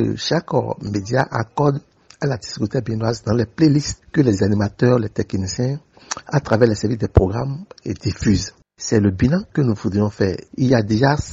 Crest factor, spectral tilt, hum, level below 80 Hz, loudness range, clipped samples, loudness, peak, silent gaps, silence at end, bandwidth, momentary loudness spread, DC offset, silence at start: 18 dB; -6.5 dB/octave; none; -38 dBFS; 2 LU; under 0.1%; -19 LUFS; 0 dBFS; none; 0 s; 8 kHz; 9 LU; under 0.1%; 0 s